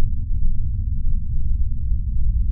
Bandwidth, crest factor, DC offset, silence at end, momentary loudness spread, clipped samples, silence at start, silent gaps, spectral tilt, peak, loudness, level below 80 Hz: 0.3 kHz; 12 dB; under 0.1%; 0 s; 2 LU; under 0.1%; 0 s; none; -18 dB/octave; -6 dBFS; -26 LUFS; -20 dBFS